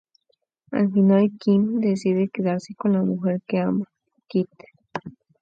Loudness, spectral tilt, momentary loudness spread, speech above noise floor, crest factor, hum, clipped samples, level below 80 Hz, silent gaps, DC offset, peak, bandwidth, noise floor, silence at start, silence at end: -22 LUFS; -8.5 dB/octave; 16 LU; 50 dB; 16 dB; none; under 0.1%; -68 dBFS; none; under 0.1%; -8 dBFS; 7.8 kHz; -71 dBFS; 0.7 s; 0.3 s